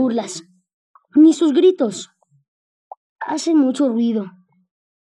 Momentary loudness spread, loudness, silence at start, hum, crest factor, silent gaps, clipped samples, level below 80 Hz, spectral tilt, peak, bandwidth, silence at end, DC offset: 20 LU; -17 LUFS; 0 s; none; 16 dB; 0.73-0.94 s, 2.48-2.91 s, 2.97-3.16 s; under 0.1%; -80 dBFS; -5 dB/octave; -4 dBFS; 11 kHz; 0.8 s; under 0.1%